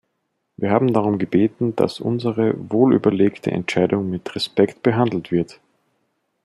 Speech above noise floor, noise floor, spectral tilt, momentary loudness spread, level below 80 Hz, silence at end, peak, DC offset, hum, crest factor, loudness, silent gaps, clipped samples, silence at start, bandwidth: 54 dB; -73 dBFS; -7.5 dB/octave; 7 LU; -60 dBFS; 0.9 s; -2 dBFS; under 0.1%; none; 18 dB; -20 LUFS; none; under 0.1%; 0.6 s; 12 kHz